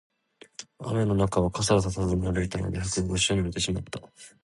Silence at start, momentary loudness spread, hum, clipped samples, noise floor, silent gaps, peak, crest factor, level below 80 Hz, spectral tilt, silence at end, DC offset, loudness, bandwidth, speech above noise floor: 0.6 s; 16 LU; none; under 0.1%; -49 dBFS; none; -8 dBFS; 18 dB; -42 dBFS; -5 dB/octave; 0.15 s; under 0.1%; -27 LUFS; 11.5 kHz; 22 dB